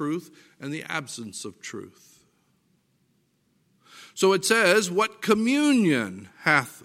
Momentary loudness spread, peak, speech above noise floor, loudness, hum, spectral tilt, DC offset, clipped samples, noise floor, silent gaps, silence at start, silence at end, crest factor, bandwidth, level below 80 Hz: 18 LU; -4 dBFS; 44 dB; -23 LUFS; none; -4 dB/octave; under 0.1%; under 0.1%; -68 dBFS; none; 0 s; 0.05 s; 22 dB; 16 kHz; -72 dBFS